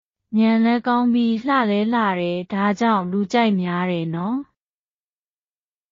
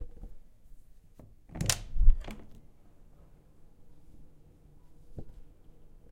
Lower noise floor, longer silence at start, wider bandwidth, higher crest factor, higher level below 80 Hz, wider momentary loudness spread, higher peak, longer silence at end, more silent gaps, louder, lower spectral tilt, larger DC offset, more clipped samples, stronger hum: first, under -90 dBFS vs -55 dBFS; first, 0.3 s vs 0 s; second, 7.4 kHz vs 16 kHz; second, 14 dB vs 26 dB; second, -64 dBFS vs -34 dBFS; second, 6 LU vs 27 LU; about the same, -6 dBFS vs -6 dBFS; first, 1.5 s vs 0.7 s; neither; first, -20 LUFS vs -33 LUFS; first, -5 dB/octave vs -3 dB/octave; neither; neither; neither